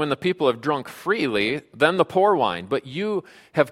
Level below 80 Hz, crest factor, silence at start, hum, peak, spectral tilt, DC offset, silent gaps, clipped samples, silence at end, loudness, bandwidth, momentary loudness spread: -62 dBFS; 20 dB; 0 s; none; -2 dBFS; -6 dB/octave; under 0.1%; none; under 0.1%; 0 s; -23 LUFS; 15 kHz; 8 LU